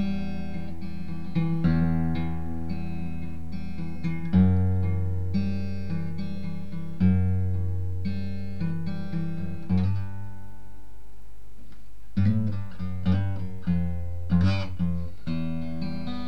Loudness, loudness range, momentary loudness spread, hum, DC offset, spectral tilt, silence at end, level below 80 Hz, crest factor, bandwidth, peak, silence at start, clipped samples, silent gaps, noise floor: -29 LUFS; 5 LU; 12 LU; none; 4%; -9 dB/octave; 0 s; -44 dBFS; 18 dB; 6 kHz; -8 dBFS; 0 s; under 0.1%; none; -49 dBFS